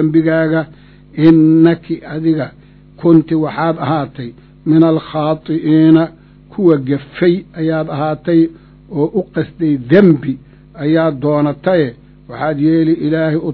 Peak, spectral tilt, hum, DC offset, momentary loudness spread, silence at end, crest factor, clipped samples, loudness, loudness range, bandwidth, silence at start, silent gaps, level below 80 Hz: 0 dBFS; -11 dB/octave; none; under 0.1%; 13 LU; 0 s; 14 dB; 0.3%; -14 LUFS; 2 LU; 4.5 kHz; 0 s; none; -48 dBFS